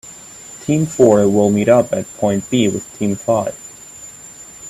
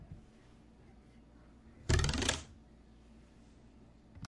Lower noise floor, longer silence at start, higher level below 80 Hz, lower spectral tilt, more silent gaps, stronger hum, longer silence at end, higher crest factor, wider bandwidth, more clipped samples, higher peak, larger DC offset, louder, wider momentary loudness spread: second, -37 dBFS vs -60 dBFS; about the same, 0.05 s vs 0 s; second, -52 dBFS vs -46 dBFS; first, -6 dB/octave vs -4 dB/octave; neither; neither; about the same, 0 s vs 0.05 s; second, 16 dB vs 26 dB; first, 15.5 kHz vs 11.5 kHz; neither; first, 0 dBFS vs -14 dBFS; neither; first, -16 LUFS vs -35 LUFS; second, 22 LU vs 28 LU